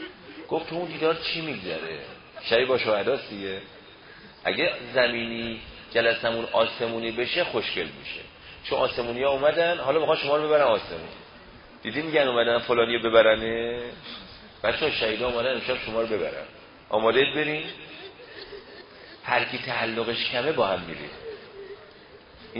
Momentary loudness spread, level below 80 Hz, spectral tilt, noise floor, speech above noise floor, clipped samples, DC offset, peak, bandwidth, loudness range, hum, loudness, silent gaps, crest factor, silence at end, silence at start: 20 LU; -56 dBFS; -8.5 dB/octave; -49 dBFS; 24 dB; under 0.1%; under 0.1%; -4 dBFS; 5.4 kHz; 4 LU; none; -25 LUFS; none; 22 dB; 0 s; 0 s